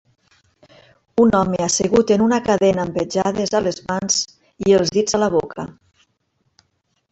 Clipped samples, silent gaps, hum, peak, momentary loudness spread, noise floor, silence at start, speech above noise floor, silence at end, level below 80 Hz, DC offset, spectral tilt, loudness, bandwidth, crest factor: under 0.1%; none; none; -2 dBFS; 9 LU; -68 dBFS; 1.15 s; 51 dB; 1.4 s; -50 dBFS; under 0.1%; -4.5 dB/octave; -18 LUFS; 8.2 kHz; 16 dB